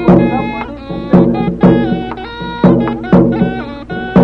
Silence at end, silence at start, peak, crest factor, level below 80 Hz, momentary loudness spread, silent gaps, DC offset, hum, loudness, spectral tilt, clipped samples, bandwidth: 0 s; 0 s; 0 dBFS; 12 dB; -32 dBFS; 13 LU; none; under 0.1%; none; -12 LUFS; -10 dB/octave; under 0.1%; 5.4 kHz